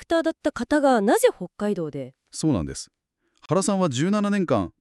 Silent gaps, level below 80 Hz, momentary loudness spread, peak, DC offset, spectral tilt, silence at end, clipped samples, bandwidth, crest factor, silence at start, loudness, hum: none; -52 dBFS; 14 LU; -6 dBFS; under 0.1%; -5.5 dB/octave; 0.1 s; under 0.1%; 13.5 kHz; 16 dB; 0 s; -23 LUFS; none